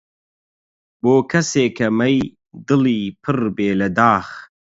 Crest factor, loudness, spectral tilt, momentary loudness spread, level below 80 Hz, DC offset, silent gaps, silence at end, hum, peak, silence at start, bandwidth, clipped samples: 18 dB; -18 LUFS; -5.5 dB/octave; 10 LU; -52 dBFS; under 0.1%; none; 0.35 s; none; 0 dBFS; 1.05 s; 7.8 kHz; under 0.1%